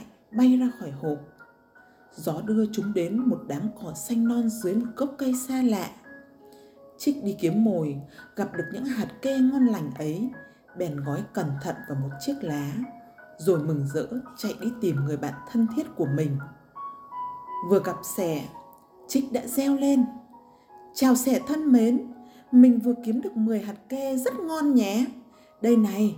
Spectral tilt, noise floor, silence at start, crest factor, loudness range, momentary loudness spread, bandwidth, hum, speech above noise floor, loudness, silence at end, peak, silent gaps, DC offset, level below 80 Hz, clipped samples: -6.5 dB/octave; -56 dBFS; 0 s; 20 dB; 7 LU; 13 LU; 17 kHz; none; 31 dB; -26 LUFS; 0 s; -6 dBFS; none; under 0.1%; -66 dBFS; under 0.1%